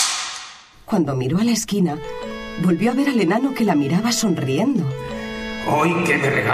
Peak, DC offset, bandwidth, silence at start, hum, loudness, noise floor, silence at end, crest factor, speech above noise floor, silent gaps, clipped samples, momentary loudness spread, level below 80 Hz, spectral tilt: -4 dBFS; under 0.1%; 16 kHz; 0 s; none; -20 LUFS; -40 dBFS; 0 s; 16 dB; 21 dB; none; under 0.1%; 11 LU; -48 dBFS; -5 dB/octave